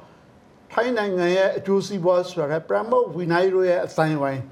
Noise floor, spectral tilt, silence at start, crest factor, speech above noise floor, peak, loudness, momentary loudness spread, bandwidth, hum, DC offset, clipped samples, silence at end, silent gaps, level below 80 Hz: -51 dBFS; -6.5 dB/octave; 0.7 s; 16 dB; 30 dB; -4 dBFS; -22 LUFS; 5 LU; 12 kHz; none; under 0.1%; under 0.1%; 0 s; none; -66 dBFS